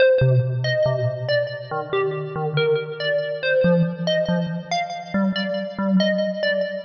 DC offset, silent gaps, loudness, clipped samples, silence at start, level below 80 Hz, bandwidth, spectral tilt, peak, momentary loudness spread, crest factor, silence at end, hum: under 0.1%; none; -22 LUFS; under 0.1%; 0 s; -54 dBFS; 6.6 kHz; -7 dB/octave; -6 dBFS; 7 LU; 14 dB; 0 s; none